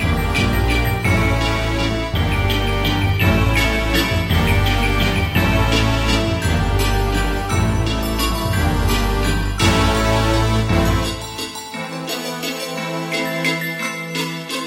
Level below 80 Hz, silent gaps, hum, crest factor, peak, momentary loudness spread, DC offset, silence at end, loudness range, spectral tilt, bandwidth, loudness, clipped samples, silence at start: -24 dBFS; none; none; 16 dB; -2 dBFS; 8 LU; under 0.1%; 0 s; 4 LU; -5 dB/octave; 16.5 kHz; -18 LUFS; under 0.1%; 0 s